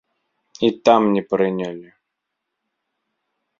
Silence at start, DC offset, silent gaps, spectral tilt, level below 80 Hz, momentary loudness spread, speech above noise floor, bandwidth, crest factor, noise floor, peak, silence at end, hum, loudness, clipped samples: 0.6 s; under 0.1%; none; -6 dB/octave; -64 dBFS; 14 LU; 61 dB; 7.4 kHz; 22 dB; -79 dBFS; 0 dBFS; 1.8 s; none; -18 LUFS; under 0.1%